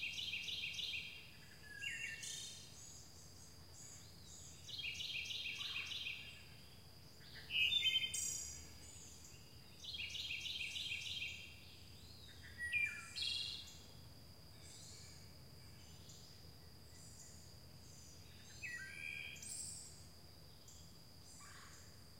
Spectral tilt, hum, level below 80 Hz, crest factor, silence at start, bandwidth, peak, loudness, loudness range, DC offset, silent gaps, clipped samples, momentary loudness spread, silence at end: -0.5 dB/octave; none; -68 dBFS; 22 dB; 0 s; 16 kHz; -26 dBFS; -43 LUFS; 17 LU; under 0.1%; none; under 0.1%; 19 LU; 0 s